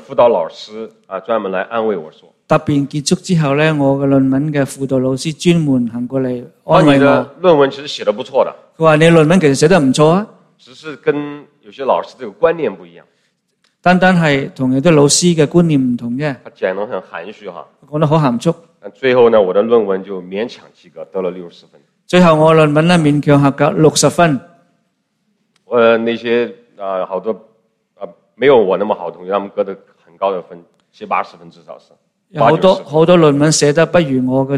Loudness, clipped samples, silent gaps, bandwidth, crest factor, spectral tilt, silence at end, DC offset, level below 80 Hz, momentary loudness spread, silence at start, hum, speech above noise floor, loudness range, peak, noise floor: -13 LUFS; under 0.1%; none; 13.5 kHz; 14 dB; -5.5 dB/octave; 0 s; under 0.1%; -50 dBFS; 16 LU; 0.1 s; none; 52 dB; 6 LU; 0 dBFS; -65 dBFS